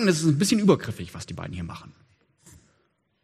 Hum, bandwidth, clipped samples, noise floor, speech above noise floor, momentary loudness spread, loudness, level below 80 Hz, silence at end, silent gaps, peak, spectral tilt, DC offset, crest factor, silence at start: none; 14.5 kHz; under 0.1%; -70 dBFS; 46 dB; 16 LU; -24 LUFS; -56 dBFS; 1.35 s; none; -6 dBFS; -5.5 dB/octave; under 0.1%; 20 dB; 0 s